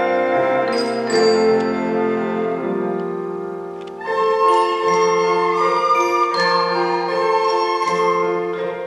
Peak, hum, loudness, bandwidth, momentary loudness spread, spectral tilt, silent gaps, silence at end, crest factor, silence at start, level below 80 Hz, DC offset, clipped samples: -4 dBFS; none; -18 LUFS; 12 kHz; 8 LU; -4.5 dB/octave; none; 0 s; 14 dB; 0 s; -66 dBFS; under 0.1%; under 0.1%